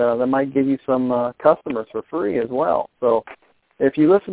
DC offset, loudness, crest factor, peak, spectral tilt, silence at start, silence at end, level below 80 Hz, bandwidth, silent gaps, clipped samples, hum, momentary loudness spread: under 0.1%; -20 LUFS; 18 dB; 0 dBFS; -11 dB/octave; 0 s; 0 s; -58 dBFS; 4 kHz; none; under 0.1%; none; 6 LU